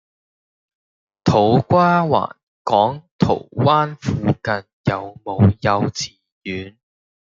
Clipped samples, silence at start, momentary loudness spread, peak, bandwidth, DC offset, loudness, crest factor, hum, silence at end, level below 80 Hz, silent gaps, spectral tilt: under 0.1%; 1.25 s; 15 LU; -2 dBFS; 7.6 kHz; under 0.1%; -18 LUFS; 18 dB; none; 0.7 s; -50 dBFS; 2.43-2.65 s, 3.11-3.19 s, 4.73-4.84 s, 6.32-6.41 s; -6.5 dB/octave